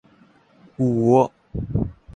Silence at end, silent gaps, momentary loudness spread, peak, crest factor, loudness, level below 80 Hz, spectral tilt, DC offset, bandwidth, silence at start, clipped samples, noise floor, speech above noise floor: 0.05 s; none; 10 LU; -4 dBFS; 20 dB; -21 LUFS; -40 dBFS; -9.5 dB/octave; under 0.1%; 9.6 kHz; 0.8 s; under 0.1%; -55 dBFS; 36 dB